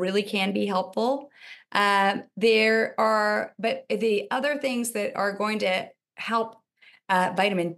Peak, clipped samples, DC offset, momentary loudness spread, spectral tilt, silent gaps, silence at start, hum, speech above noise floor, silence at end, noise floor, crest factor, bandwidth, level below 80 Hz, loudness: -6 dBFS; under 0.1%; under 0.1%; 8 LU; -4 dB/octave; none; 0 s; none; 27 dB; 0 s; -52 dBFS; 20 dB; 12.5 kHz; -84 dBFS; -25 LUFS